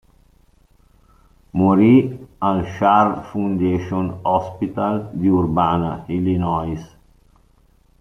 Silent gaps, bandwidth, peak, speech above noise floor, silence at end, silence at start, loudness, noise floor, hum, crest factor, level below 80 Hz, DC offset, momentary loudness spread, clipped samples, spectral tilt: none; 6.4 kHz; -2 dBFS; 37 dB; 1.15 s; 1.55 s; -19 LUFS; -55 dBFS; none; 18 dB; -48 dBFS; under 0.1%; 10 LU; under 0.1%; -9 dB/octave